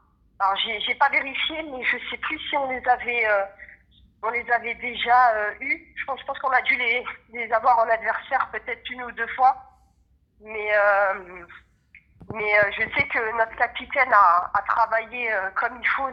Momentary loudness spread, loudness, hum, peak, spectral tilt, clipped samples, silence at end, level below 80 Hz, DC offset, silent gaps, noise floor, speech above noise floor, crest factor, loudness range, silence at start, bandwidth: 12 LU; -22 LUFS; none; -4 dBFS; -5 dB/octave; under 0.1%; 0 s; -56 dBFS; under 0.1%; none; -63 dBFS; 39 dB; 20 dB; 4 LU; 0.4 s; 6.2 kHz